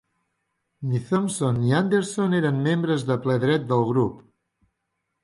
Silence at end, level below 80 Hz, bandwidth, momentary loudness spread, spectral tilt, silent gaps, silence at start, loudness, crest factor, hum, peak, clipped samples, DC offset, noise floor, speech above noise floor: 1.05 s; -60 dBFS; 11.5 kHz; 5 LU; -6.5 dB/octave; none; 0.8 s; -23 LUFS; 16 dB; none; -8 dBFS; under 0.1%; under 0.1%; -78 dBFS; 56 dB